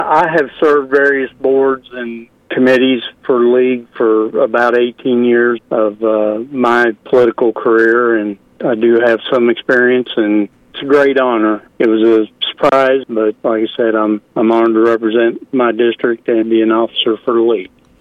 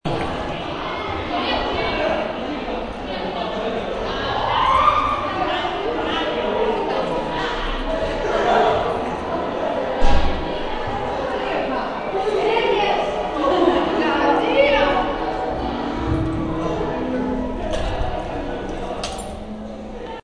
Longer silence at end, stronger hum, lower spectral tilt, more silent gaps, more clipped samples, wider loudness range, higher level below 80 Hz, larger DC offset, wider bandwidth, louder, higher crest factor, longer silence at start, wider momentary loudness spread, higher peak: first, 0.35 s vs 0.05 s; neither; about the same, -6.5 dB/octave vs -5.5 dB/octave; neither; neither; second, 1 LU vs 5 LU; second, -58 dBFS vs -30 dBFS; neither; second, 7 kHz vs 10.5 kHz; first, -13 LUFS vs -21 LUFS; second, 12 dB vs 18 dB; about the same, 0 s vs 0.05 s; second, 6 LU vs 10 LU; about the same, 0 dBFS vs -2 dBFS